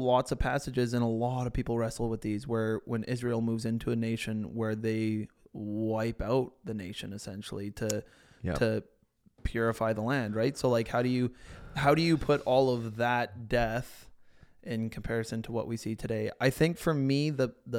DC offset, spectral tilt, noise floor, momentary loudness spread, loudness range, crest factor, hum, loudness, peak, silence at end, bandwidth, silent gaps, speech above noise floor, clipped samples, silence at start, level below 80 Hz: under 0.1%; -6.5 dB/octave; -64 dBFS; 11 LU; 6 LU; 20 dB; none; -31 LUFS; -10 dBFS; 0 s; 16.5 kHz; none; 34 dB; under 0.1%; 0 s; -48 dBFS